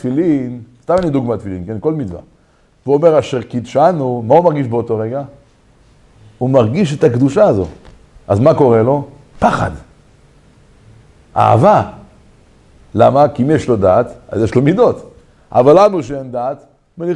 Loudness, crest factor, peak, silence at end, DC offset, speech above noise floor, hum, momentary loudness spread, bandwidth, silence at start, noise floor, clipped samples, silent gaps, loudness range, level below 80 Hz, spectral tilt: -13 LUFS; 14 dB; 0 dBFS; 0 s; under 0.1%; 39 dB; none; 15 LU; 11 kHz; 0.05 s; -52 dBFS; 0.1%; none; 3 LU; -44 dBFS; -8 dB/octave